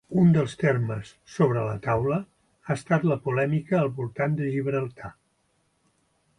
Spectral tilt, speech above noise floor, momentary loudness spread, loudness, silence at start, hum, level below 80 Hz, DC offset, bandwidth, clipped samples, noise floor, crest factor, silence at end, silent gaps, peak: -8.5 dB/octave; 45 dB; 14 LU; -25 LUFS; 0.1 s; none; -56 dBFS; under 0.1%; 11 kHz; under 0.1%; -70 dBFS; 18 dB; 1.25 s; none; -8 dBFS